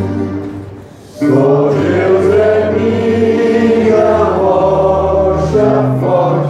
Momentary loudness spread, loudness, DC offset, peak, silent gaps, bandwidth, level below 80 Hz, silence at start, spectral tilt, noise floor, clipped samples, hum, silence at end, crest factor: 8 LU; -11 LUFS; under 0.1%; 0 dBFS; none; 10 kHz; -34 dBFS; 0 s; -8 dB/octave; -32 dBFS; under 0.1%; none; 0 s; 10 dB